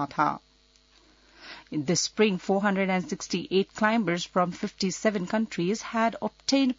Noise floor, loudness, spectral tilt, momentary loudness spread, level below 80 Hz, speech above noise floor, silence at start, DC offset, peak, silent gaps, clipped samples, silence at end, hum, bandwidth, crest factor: -61 dBFS; -27 LUFS; -4.5 dB/octave; 7 LU; -64 dBFS; 35 dB; 0 s; under 0.1%; -8 dBFS; none; under 0.1%; 0.05 s; none; 7.8 kHz; 18 dB